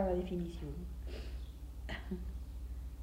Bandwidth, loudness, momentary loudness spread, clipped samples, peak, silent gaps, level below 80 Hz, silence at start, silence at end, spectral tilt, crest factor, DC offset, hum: 16 kHz; -44 LUFS; 9 LU; under 0.1%; -22 dBFS; none; -44 dBFS; 0 s; 0 s; -7.5 dB/octave; 20 dB; under 0.1%; none